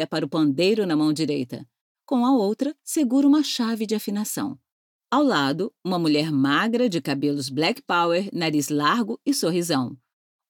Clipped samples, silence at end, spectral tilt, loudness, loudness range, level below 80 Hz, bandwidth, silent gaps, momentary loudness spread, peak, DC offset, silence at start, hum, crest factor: under 0.1%; 0.55 s; -4.5 dB/octave; -23 LUFS; 1 LU; -76 dBFS; 18 kHz; 1.81-1.95 s, 4.72-5.00 s; 7 LU; -8 dBFS; under 0.1%; 0 s; none; 16 dB